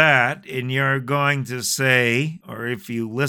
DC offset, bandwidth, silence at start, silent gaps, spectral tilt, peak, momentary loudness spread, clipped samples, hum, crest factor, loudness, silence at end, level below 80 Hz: under 0.1%; 19 kHz; 0 s; none; -4 dB/octave; -2 dBFS; 12 LU; under 0.1%; none; 20 dB; -20 LUFS; 0 s; -66 dBFS